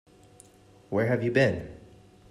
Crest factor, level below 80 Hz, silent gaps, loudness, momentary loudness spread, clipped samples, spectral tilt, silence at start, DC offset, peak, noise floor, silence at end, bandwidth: 20 dB; -58 dBFS; none; -26 LUFS; 13 LU; under 0.1%; -7 dB/octave; 0.9 s; under 0.1%; -8 dBFS; -56 dBFS; 0.5 s; 12.5 kHz